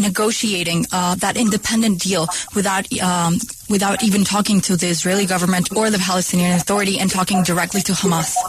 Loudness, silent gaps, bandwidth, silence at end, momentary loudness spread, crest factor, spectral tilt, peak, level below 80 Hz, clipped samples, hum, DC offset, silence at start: -17 LUFS; none; 14 kHz; 0 s; 3 LU; 12 dB; -4 dB/octave; -4 dBFS; -48 dBFS; under 0.1%; none; under 0.1%; 0 s